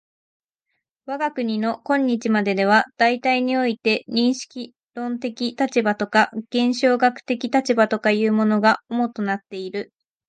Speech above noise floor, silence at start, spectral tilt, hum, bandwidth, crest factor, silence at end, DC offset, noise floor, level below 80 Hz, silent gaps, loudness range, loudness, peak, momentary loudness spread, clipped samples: 57 dB; 1.1 s; -5 dB/octave; none; 9.2 kHz; 18 dB; 0.45 s; under 0.1%; -77 dBFS; -72 dBFS; 4.86-4.90 s; 2 LU; -21 LUFS; -4 dBFS; 12 LU; under 0.1%